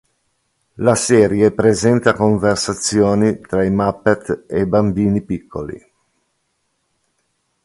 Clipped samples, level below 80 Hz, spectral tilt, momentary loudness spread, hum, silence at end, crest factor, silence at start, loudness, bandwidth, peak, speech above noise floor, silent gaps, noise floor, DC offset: under 0.1%; -44 dBFS; -5.5 dB/octave; 11 LU; none; 1.85 s; 16 dB; 0.8 s; -16 LUFS; 11.5 kHz; 0 dBFS; 53 dB; none; -68 dBFS; under 0.1%